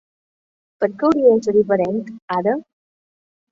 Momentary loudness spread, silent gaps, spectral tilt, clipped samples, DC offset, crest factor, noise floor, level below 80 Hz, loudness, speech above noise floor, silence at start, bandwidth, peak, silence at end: 11 LU; 2.22-2.28 s; -7.5 dB/octave; under 0.1%; under 0.1%; 16 dB; under -90 dBFS; -60 dBFS; -18 LUFS; over 73 dB; 0.8 s; 7.6 kHz; -2 dBFS; 0.9 s